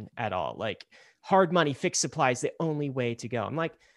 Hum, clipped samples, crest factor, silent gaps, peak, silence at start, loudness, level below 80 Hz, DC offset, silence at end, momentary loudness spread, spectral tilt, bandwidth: none; under 0.1%; 20 dB; none; -8 dBFS; 0 s; -28 LUFS; -68 dBFS; under 0.1%; 0.25 s; 9 LU; -4.5 dB/octave; 12 kHz